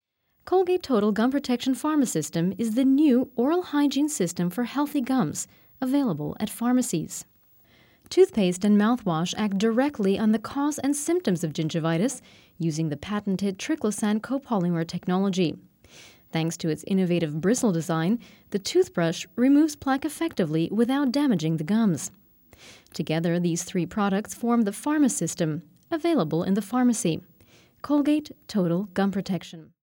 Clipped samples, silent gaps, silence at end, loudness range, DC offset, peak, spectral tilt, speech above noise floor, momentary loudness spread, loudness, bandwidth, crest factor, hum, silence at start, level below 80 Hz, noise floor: under 0.1%; none; 0.2 s; 4 LU; under 0.1%; -8 dBFS; -5.5 dB/octave; 34 dB; 8 LU; -25 LUFS; 19 kHz; 18 dB; none; 0.45 s; -64 dBFS; -59 dBFS